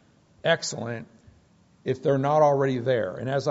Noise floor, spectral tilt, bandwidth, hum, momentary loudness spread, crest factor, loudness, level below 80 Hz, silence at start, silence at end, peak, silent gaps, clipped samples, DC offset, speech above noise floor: -59 dBFS; -4.5 dB/octave; 8 kHz; none; 14 LU; 18 dB; -25 LUFS; -66 dBFS; 0.45 s; 0 s; -8 dBFS; none; under 0.1%; under 0.1%; 35 dB